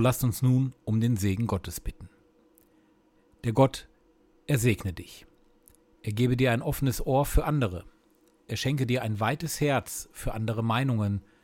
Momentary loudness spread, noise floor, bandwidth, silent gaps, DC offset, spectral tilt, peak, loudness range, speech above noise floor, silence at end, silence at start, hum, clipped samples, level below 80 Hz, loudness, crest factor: 13 LU; -64 dBFS; 17 kHz; none; under 0.1%; -6 dB/octave; -8 dBFS; 3 LU; 37 dB; 0.25 s; 0 s; none; under 0.1%; -42 dBFS; -28 LUFS; 20 dB